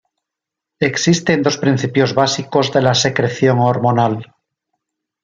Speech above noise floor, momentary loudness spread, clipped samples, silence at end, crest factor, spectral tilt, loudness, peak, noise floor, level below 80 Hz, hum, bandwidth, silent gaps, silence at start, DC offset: 68 dB; 4 LU; under 0.1%; 1 s; 16 dB; -5 dB/octave; -15 LUFS; 0 dBFS; -83 dBFS; -56 dBFS; none; 7.6 kHz; none; 0.8 s; under 0.1%